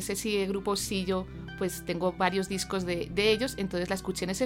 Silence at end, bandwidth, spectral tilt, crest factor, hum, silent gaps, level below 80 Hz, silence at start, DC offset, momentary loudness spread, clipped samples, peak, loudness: 0 s; 16.5 kHz; -4 dB/octave; 18 dB; none; none; -50 dBFS; 0 s; under 0.1%; 7 LU; under 0.1%; -12 dBFS; -30 LUFS